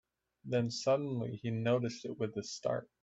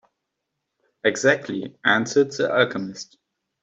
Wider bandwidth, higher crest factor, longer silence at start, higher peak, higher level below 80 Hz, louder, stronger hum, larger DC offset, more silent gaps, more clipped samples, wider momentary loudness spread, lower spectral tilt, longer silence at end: about the same, 8 kHz vs 8.2 kHz; about the same, 16 dB vs 20 dB; second, 0.45 s vs 1.05 s; second, -20 dBFS vs -4 dBFS; second, -74 dBFS vs -68 dBFS; second, -36 LUFS vs -21 LUFS; neither; neither; neither; neither; second, 7 LU vs 14 LU; first, -6 dB/octave vs -4 dB/octave; second, 0.2 s vs 0.6 s